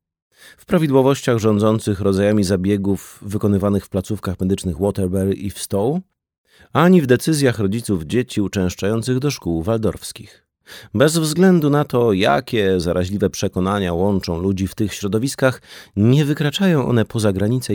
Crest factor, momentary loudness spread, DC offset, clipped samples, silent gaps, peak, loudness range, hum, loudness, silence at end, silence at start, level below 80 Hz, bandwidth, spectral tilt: 16 dB; 8 LU; under 0.1%; under 0.1%; 6.38-6.44 s; -2 dBFS; 4 LU; none; -18 LUFS; 0 s; 0.7 s; -46 dBFS; 19 kHz; -6 dB/octave